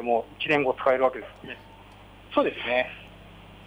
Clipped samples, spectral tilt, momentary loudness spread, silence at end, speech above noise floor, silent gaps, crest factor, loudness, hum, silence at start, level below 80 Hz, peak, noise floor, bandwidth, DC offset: under 0.1%; -6 dB/octave; 19 LU; 0 s; 23 dB; none; 18 dB; -25 LUFS; 50 Hz at -55 dBFS; 0 s; -56 dBFS; -10 dBFS; -49 dBFS; 11 kHz; under 0.1%